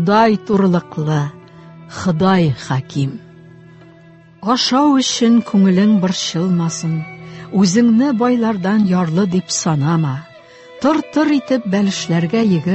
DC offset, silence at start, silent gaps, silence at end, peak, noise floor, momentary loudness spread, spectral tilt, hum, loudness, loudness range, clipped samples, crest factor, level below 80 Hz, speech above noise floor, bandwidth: under 0.1%; 0 s; none; 0 s; -2 dBFS; -43 dBFS; 10 LU; -5.5 dB/octave; none; -15 LUFS; 4 LU; under 0.1%; 14 dB; -52 dBFS; 29 dB; 8.4 kHz